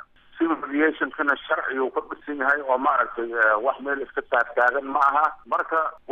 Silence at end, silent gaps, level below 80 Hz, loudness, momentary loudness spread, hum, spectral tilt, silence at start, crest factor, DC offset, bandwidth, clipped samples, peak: 0 s; none; -62 dBFS; -23 LUFS; 7 LU; none; -5 dB/octave; 0.35 s; 16 dB; under 0.1%; 8.4 kHz; under 0.1%; -8 dBFS